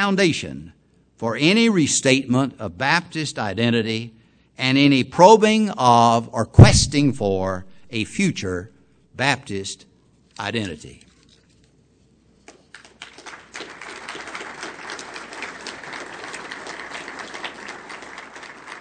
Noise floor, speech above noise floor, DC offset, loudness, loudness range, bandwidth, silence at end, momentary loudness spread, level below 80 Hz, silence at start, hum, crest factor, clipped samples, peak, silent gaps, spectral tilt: -57 dBFS; 40 dB; under 0.1%; -18 LUFS; 20 LU; 9.4 kHz; 0 s; 22 LU; -38 dBFS; 0 s; none; 20 dB; 0.1%; 0 dBFS; none; -5 dB/octave